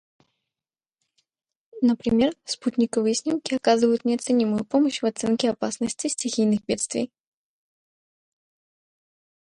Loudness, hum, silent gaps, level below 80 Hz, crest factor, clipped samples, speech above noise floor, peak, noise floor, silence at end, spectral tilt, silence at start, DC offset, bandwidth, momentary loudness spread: -24 LUFS; none; none; -60 dBFS; 18 dB; under 0.1%; over 67 dB; -6 dBFS; under -90 dBFS; 2.4 s; -4 dB/octave; 1.75 s; under 0.1%; 11 kHz; 6 LU